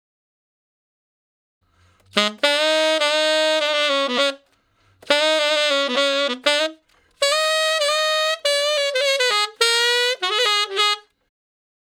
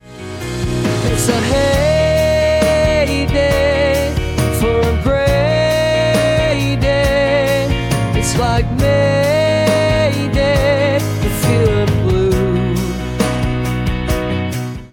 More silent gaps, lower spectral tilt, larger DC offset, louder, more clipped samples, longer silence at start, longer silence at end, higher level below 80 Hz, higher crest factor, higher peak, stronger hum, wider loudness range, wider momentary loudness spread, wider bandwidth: neither; second, 0 dB/octave vs -5.5 dB/octave; neither; second, -18 LUFS vs -15 LUFS; neither; first, 2.15 s vs 0.05 s; first, 1 s vs 0.05 s; second, -76 dBFS vs -26 dBFS; first, 20 dB vs 12 dB; about the same, 0 dBFS vs -2 dBFS; neither; about the same, 2 LU vs 2 LU; about the same, 4 LU vs 5 LU; about the same, 17.5 kHz vs 18.5 kHz